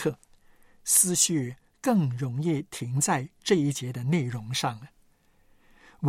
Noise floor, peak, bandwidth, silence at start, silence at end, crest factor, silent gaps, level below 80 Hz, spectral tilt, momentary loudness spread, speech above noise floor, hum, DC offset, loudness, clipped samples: -62 dBFS; -6 dBFS; 16.5 kHz; 0 s; 0 s; 22 dB; none; -64 dBFS; -4 dB/octave; 12 LU; 36 dB; none; under 0.1%; -26 LUFS; under 0.1%